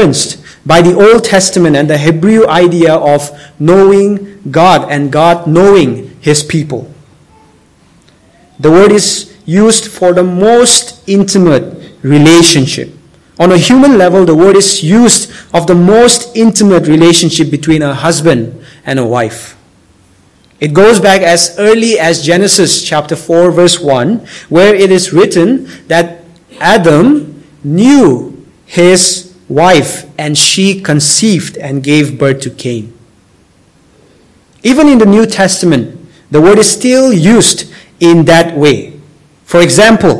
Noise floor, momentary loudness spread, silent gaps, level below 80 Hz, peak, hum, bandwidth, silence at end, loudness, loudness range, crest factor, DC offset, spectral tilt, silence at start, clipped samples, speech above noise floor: -46 dBFS; 11 LU; none; -40 dBFS; 0 dBFS; none; 12 kHz; 0 s; -7 LUFS; 5 LU; 8 dB; 0.4%; -4.5 dB/octave; 0 s; 8%; 39 dB